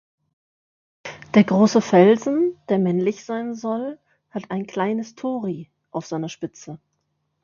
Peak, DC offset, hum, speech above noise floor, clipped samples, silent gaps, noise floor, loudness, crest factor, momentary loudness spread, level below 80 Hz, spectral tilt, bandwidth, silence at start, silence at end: -2 dBFS; under 0.1%; none; 53 dB; under 0.1%; none; -73 dBFS; -21 LUFS; 20 dB; 19 LU; -66 dBFS; -6.5 dB/octave; 7.2 kHz; 1.05 s; 0.65 s